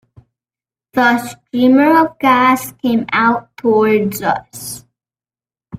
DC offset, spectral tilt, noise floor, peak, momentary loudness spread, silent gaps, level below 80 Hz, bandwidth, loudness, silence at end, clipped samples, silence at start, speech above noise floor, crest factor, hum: under 0.1%; -5 dB/octave; under -90 dBFS; 0 dBFS; 13 LU; none; -56 dBFS; 16 kHz; -14 LUFS; 0 s; under 0.1%; 0.95 s; over 76 dB; 16 dB; none